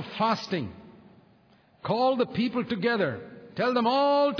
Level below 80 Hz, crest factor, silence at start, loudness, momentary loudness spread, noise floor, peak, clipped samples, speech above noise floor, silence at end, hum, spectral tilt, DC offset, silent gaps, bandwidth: -66 dBFS; 14 dB; 0 s; -26 LUFS; 16 LU; -60 dBFS; -12 dBFS; under 0.1%; 35 dB; 0 s; none; -6.5 dB/octave; under 0.1%; none; 5.4 kHz